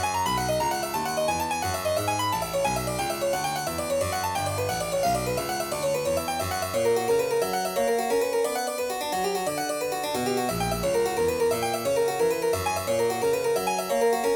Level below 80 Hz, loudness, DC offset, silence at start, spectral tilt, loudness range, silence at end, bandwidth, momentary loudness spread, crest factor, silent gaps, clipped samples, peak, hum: -50 dBFS; -26 LUFS; under 0.1%; 0 s; -3.5 dB/octave; 2 LU; 0 s; over 20 kHz; 4 LU; 14 dB; none; under 0.1%; -12 dBFS; none